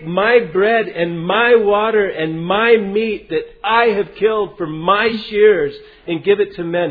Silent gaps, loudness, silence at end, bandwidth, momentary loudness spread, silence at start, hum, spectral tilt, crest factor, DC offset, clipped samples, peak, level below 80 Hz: none; -15 LUFS; 0 s; 5 kHz; 9 LU; 0 s; none; -8.5 dB/octave; 16 dB; under 0.1%; under 0.1%; 0 dBFS; -50 dBFS